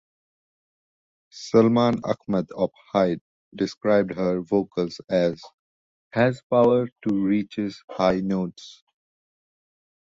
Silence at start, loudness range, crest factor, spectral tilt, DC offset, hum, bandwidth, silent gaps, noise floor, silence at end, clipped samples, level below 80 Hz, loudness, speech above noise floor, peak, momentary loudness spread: 1.35 s; 2 LU; 20 dB; -7 dB/octave; under 0.1%; none; 7.8 kHz; 3.21-3.52 s, 3.77-3.81 s, 5.54-6.11 s, 6.43-6.50 s, 6.92-6.96 s, 7.84-7.88 s; under -90 dBFS; 1.35 s; under 0.1%; -58 dBFS; -23 LUFS; over 67 dB; -4 dBFS; 11 LU